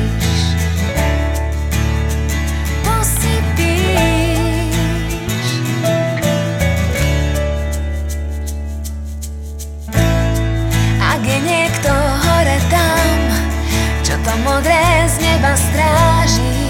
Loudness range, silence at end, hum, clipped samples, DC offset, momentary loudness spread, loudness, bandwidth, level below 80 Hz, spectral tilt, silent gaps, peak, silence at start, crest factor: 5 LU; 0 s; none; under 0.1%; under 0.1%; 9 LU; -15 LUFS; 17.5 kHz; -20 dBFS; -5 dB/octave; none; -2 dBFS; 0 s; 14 dB